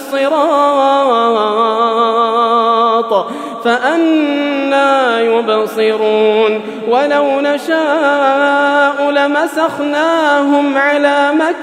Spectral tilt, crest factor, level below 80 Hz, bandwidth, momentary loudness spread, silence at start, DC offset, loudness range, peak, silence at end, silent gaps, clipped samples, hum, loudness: -4 dB/octave; 12 dB; -72 dBFS; 15.5 kHz; 4 LU; 0 s; under 0.1%; 1 LU; 0 dBFS; 0 s; none; under 0.1%; none; -12 LUFS